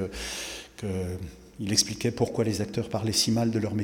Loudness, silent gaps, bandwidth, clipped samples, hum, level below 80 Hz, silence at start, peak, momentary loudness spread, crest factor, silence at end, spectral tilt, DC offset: -28 LUFS; none; 18 kHz; under 0.1%; none; -52 dBFS; 0 s; -6 dBFS; 13 LU; 22 dB; 0 s; -4 dB/octave; under 0.1%